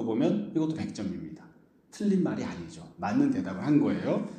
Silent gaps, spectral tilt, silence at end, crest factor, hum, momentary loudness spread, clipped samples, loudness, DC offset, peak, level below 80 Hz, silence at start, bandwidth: none; -7.5 dB/octave; 0 s; 16 dB; none; 15 LU; under 0.1%; -29 LUFS; under 0.1%; -12 dBFS; -64 dBFS; 0 s; 9.4 kHz